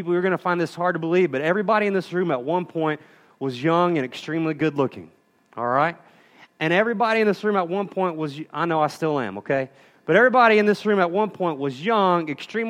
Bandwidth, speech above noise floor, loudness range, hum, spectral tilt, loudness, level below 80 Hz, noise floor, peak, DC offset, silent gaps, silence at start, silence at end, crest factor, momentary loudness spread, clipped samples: 12.5 kHz; 31 dB; 4 LU; none; -6.5 dB/octave; -22 LUFS; -72 dBFS; -53 dBFS; -2 dBFS; under 0.1%; none; 0 s; 0 s; 20 dB; 9 LU; under 0.1%